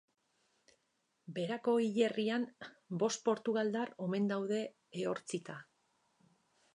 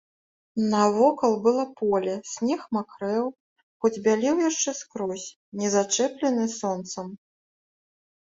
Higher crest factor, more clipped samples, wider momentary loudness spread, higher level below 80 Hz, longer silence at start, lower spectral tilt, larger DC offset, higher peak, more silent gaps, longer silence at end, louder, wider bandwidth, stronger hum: about the same, 20 dB vs 18 dB; neither; about the same, 12 LU vs 11 LU; second, -88 dBFS vs -70 dBFS; first, 1.3 s vs 0.55 s; about the same, -5 dB/octave vs -4 dB/octave; neither; second, -18 dBFS vs -8 dBFS; second, none vs 3.40-3.56 s, 3.63-3.80 s, 5.36-5.52 s; about the same, 1.1 s vs 1.1 s; second, -36 LUFS vs -25 LUFS; first, 11 kHz vs 8 kHz; neither